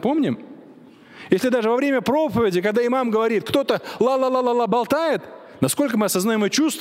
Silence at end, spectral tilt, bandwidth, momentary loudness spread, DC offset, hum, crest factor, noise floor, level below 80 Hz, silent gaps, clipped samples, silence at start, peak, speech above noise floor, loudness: 0 s; -4.5 dB/octave; 16 kHz; 4 LU; under 0.1%; none; 18 dB; -46 dBFS; -58 dBFS; none; under 0.1%; 0 s; -2 dBFS; 26 dB; -20 LUFS